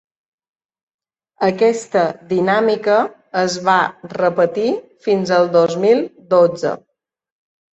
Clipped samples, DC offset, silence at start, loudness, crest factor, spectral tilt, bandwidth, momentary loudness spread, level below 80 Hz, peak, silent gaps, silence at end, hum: under 0.1%; under 0.1%; 1.4 s; -17 LUFS; 16 dB; -5.5 dB/octave; 8.4 kHz; 7 LU; -64 dBFS; -2 dBFS; none; 1 s; none